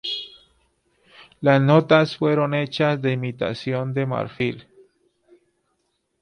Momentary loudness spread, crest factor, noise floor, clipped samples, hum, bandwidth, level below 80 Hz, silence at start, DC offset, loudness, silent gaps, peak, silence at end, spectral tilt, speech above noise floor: 12 LU; 20 dB; -72 dBFS; under 0.1%; none; 9.8 kHz; -62 dBFS; 0.05 s; under 0.1%; -21 LUFS; none; -4 dBFS; 1.6 s; -7.5 dB/octave; 52 dB